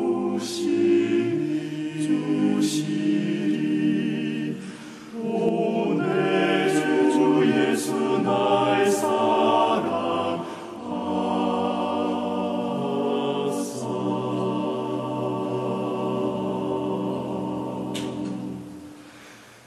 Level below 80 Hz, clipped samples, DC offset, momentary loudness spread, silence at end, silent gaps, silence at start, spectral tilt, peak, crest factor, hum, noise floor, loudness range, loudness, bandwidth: -66 dBFS; under 0.1%; under 0.1%; 11 LU; 0.15 s; none; 0 s; -5.5 dB/octave; -8 dBFS; 16 dB; none; -47 dBFS; 6 LU; -24 LUFS; 13.5 kHz